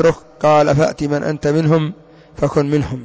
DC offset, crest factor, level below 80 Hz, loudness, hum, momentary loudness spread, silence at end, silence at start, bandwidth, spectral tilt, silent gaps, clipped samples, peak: under 0.1%; 10 dB; -42 dBFS; -16 LUFS; none; 7 LU; 0 s; 0 s; 8 kHz; -7 dB/octave; none; under 0.1%; -4 dBFS